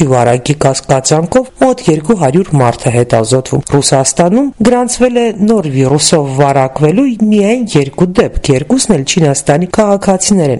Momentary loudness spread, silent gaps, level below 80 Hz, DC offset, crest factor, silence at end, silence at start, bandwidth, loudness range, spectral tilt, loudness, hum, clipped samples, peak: 3 LU; none; -32 dBFS; 0.6%; 10 dB; 0 s; 0 s; 12 kHz; 1 LU; -5 dB/octave; -10 LUFS; none; 0.2%; 0 dBFS